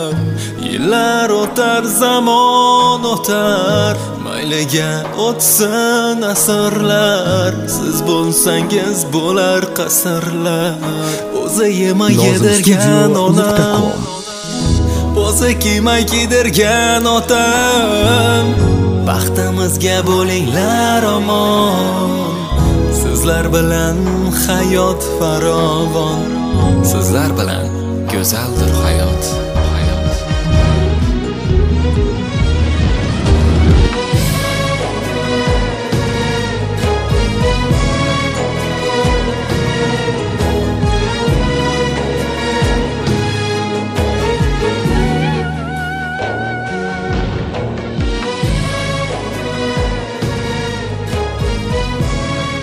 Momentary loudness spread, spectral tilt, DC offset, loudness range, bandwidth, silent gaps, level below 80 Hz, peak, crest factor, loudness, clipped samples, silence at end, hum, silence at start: 8 LU; -4.5 dB/octave; under 0.1%; 6 LU; 16 kHz; none; -22 dBFS; 0 dBFS; 14 dB; -14 LUFS; under 0.1%; 0 s; none; 0 s